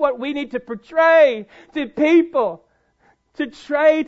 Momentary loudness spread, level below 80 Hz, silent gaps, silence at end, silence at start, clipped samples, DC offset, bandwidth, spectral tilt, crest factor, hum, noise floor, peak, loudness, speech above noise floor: 15 LU; -60 dBFS; none; 0 s; 0 s; under 0.1%; under 0.1%; 7.8 kHz; -5.5 dB/octave; 16 dB; none; -60 dBFS; -4 dBFS; -18 LUFS; 42 dB